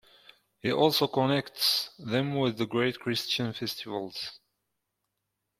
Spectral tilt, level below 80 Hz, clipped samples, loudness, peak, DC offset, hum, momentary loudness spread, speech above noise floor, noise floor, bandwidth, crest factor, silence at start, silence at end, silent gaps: -4.5 dB/octave; -68 dBFS; under 0.1%; -28 LUFS; -10 dBFS; under 0.1%; none; 11 LU; 54 dB; -83 dBFS; 16.5 kHz; 22 dB; 0.65 s; 1.25 s; none